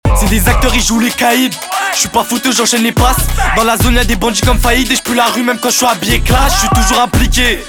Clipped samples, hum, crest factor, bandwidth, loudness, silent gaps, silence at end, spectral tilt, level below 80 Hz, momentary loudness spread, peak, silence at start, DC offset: under 0.1%; none; 10 dB; 19.5 kHz; -11 LUFS; none; 0 s; -3.5 dB/octave; -16 dBFS; 3 LU; 0 dBFS; 0.05 s; under 0.1%